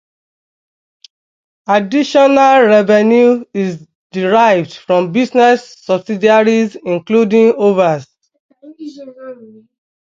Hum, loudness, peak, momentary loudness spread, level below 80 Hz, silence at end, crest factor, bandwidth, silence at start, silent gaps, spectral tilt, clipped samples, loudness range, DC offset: none; -12 LUFS; 0 dBFS; 22 LU; -62 dBFS; 0.6 s; 14 dB; 7.6 kHz; 1.7 s; 3.95-4.10 s, 8.40-8.49 s; -6 dB/octave; under 0.1%; 3 LU; under 0.1%